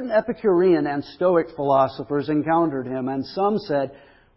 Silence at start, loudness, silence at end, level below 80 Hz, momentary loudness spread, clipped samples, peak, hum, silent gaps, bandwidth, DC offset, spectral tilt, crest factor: 0 s; -22 LUFS; 0.45 s; -58 dBFS; 8 LU; under 0.1%; -6 dBFS; none; none; 5.8 kHz; under 0.1%; -11.5 dB/octave; 16 dB